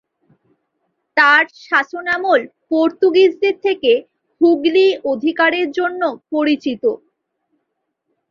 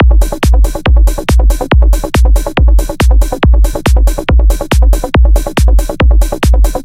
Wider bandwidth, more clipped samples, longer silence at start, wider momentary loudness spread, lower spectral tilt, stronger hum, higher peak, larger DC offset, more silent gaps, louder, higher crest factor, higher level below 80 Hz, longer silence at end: second, 7 kHz vs 15.5 kHz; neither; first, 1.15 s vs 0 s; first, 8 LU vs 1 LU; second, -4.5 dB/octave vs -6 dB/octave; neither; about the same, -2 dBFS vs 0 dBFS; neither; neither; second, -16 LUFS vs -11 LUFS; first, 16 dB vs 8 dB; second, -66 dBFS vs -8 dBFS; first, 1.35 s vs 0 s